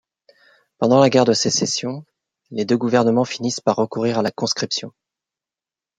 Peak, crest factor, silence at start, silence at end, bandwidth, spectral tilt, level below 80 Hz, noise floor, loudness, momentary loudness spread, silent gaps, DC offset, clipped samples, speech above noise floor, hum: -2 dBFS; 18 dB; 0.8 s; 1.1 s; 9.4 kHz; -4.5 dB/octave; -64 dBFS; under -90 dBFS; -19 LUFS; 13 LU; none; under 0.1%; under 0.1%; over 72 dB; none